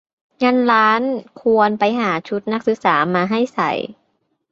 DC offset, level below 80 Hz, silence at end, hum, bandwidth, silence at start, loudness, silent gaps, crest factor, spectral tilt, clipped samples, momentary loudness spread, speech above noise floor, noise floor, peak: under 0.1%; -64 dBFS; 0.6 s; none; 7.6 kHz; 0.4 s; -17 LUFS; none; 16 dB; -6.5 dB/octave; under 0.1%; 9 LU; 50 dB; -67 dBFS; -2 dBFS